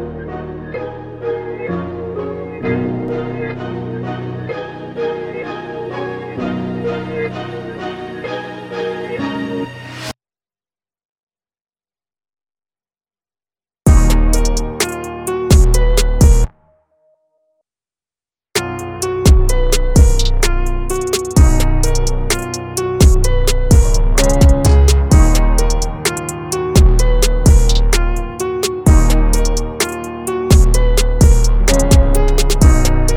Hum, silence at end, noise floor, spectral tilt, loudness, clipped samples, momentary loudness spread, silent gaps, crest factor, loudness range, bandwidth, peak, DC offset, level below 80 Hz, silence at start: none; 0 s; under -90 dBFS; -5 dB/octave; -16 LUFS; under 0.1%; 14 LU; 11.05-11.16 s, 11.23-11.27 s; 14 dB; 11 LU; 17 kHz; 0 dBFS; under 0.1%; -14 dBFS; 0 s